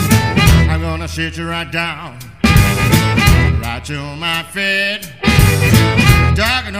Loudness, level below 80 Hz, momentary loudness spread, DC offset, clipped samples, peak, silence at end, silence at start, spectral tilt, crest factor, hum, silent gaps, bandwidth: -13 LUFS; -22 dBFS; 11 LU; 0.5%; 0.2%; 0 dBFS; 0 s; 0 s; -5 dB/octave; 14 dB; none; none; 16 kHz